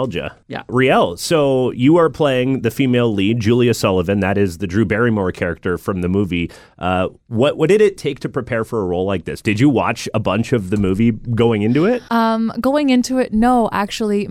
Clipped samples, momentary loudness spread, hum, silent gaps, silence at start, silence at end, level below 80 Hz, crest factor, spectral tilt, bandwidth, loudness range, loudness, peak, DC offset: under 0.1%; 8 LU; none; none; 0 s; 0 s; -42 dBFS; 12 dB; -6.5 dB/octave; 16 kHz; 3 LU; -17 LUFS; -4 dBFS; under 0.1%